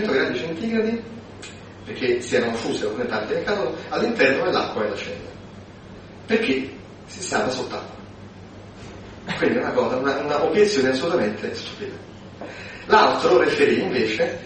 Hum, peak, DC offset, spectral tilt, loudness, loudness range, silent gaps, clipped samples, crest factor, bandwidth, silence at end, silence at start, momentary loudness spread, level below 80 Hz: none; -2 dBFS; under 0.1%; -4.5 dB/octave; -22 LUFS; 7 LU; none; under 0.1%; 22 dB; 8.8 kHz; 0 s; 0 s; 22 LU; -52 dBFS